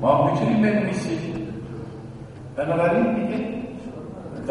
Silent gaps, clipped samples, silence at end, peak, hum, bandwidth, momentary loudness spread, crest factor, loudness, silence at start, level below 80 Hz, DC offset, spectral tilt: none; under 0.1%; 0 s; -4 dBFS; none; 11 kHz; 17 LU; 18 dB; -23 LUFS; 0 s; -50 dBFS; under 0.1%; -7.5 dB/octave